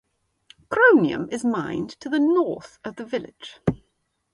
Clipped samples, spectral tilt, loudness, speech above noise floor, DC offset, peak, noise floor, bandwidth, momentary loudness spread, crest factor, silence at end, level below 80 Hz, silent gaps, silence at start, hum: under 0.1%; -6.5 dB/octave; -22 LUFS; 50 dB; under 0.1%; -4 dBFS; -72 dBFS; 11.5 kHz; 19 LU; 20 dB; 0.6 s; -56 dBFS; none; 0.7 s; none